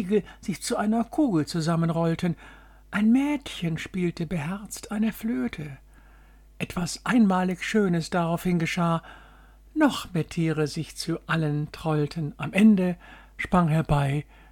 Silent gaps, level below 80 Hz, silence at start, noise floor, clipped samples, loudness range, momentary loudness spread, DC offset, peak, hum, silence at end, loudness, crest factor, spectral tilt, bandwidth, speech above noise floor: none; -48 dBFS; 0 s; -52 dBFS; under 0.1%; 4 LU; 11 LU; under 0.1%; -8 dBFS; none; 0.3 s; -26 LUFS; 16 dB; -6.5 dB/octave; 17.5 kHz; 27 dB